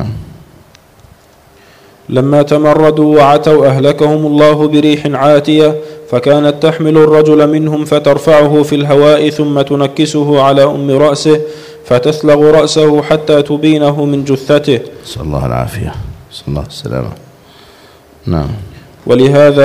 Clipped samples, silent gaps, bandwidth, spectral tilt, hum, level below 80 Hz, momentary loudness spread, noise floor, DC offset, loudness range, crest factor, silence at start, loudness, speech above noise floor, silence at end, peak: 1%; none; 15 kHz; -6.5 dB/octave; none; -36 dBFS; 14 LU; -42 dBFS; under 0.1%; 9 LU; 10 dB; 0 s; -9 LUFS; 34 dB; 0 s; 0 dBFS